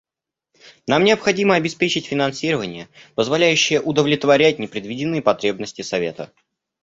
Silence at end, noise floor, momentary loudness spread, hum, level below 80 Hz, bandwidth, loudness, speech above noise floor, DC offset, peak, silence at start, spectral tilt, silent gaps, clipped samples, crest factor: 0.6 s; -86 dBFS; 14 LU; none; -58 dBFS; 8 kHz; -18 LUFS; 67 dB; under 0.1%; -2 dBFS; 0.65 s; -4 dB/octave; none; under 0.1%; 18 dB